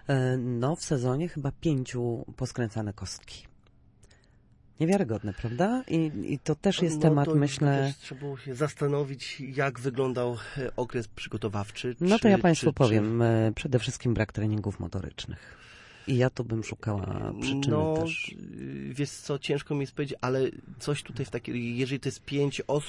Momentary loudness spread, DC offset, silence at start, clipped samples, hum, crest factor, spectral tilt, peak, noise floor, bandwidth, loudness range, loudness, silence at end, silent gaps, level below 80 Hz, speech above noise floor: 13 LU; under 0.1%; 0.05 s; under 0.1%; none; 20 dB; -6.5 dB/octave; -10 dBFS; -59 dBFS; 11.5 kHz; 7 LU; -29 LUFS; 0 s; none; -54 dBFS; 31 dB